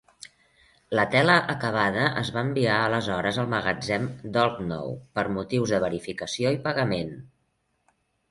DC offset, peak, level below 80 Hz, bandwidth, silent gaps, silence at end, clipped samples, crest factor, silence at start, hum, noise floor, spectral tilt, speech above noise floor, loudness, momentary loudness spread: under 0.1%; -6 dBFS; -56 dBFS; 11.5 kHz; none; 1.05 s; under 0.1%; 20 dB; 0.9 s; none; -73 dBFS; -5.5 dB/octave; 47 dB; -25 LUFS; 11 LU